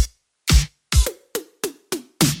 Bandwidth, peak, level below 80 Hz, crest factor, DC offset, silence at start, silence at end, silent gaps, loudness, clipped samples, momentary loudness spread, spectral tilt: 17 kHz; -2 dBFS; -24 dBFS; 20 dB; under 0.1%; 0 s; 0 s; none; -23 LUFS; under 0.1%; 12 LU; -4 dB/octave